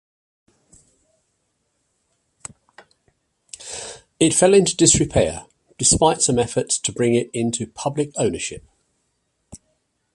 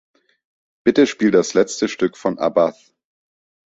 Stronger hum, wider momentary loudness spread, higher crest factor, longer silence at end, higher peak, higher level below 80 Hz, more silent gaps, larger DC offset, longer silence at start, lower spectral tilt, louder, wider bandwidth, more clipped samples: neither; first, 24 LU vs 6 LU; about the same, 22 dB vs 18 dB; second, 0.6 s vs 1.1 s; about the same, 0 dBFS vs -2 dBFS; first, -44 dBFS vs -60 dBFS; neither; neither; first, 3.6 s vs 0.85 s; about the same, -3.5 dB/octave vs -4.5 dB/octave; about the same, -18 LUFS vs -18 LUFS; first, 11.5 kHz vs 8 kHz; neither